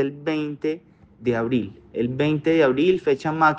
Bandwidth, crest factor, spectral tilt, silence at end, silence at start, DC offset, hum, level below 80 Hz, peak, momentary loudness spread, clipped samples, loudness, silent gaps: 7.8 kHz; 16 dB; -7.5 dB/octave; 0 s; 0 s; under 0.1%; none; -56 dBFS; -6 dBFS; 10 LU; under 0.1%; -22 LUFS; none